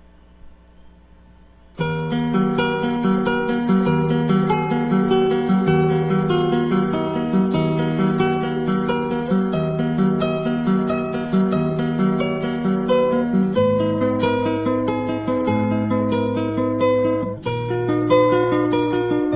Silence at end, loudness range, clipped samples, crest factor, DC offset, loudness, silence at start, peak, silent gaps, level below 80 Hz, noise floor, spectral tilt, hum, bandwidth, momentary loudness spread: 0 s; 2 LU; under 0.1%; 16 dB; under 0.1%; -20 LUFS; 0.45 s; -2 dBFS; none; -48 dBFS; -48 dBFS; -11.5 dB/octave; none; 4 kHz; 4 LU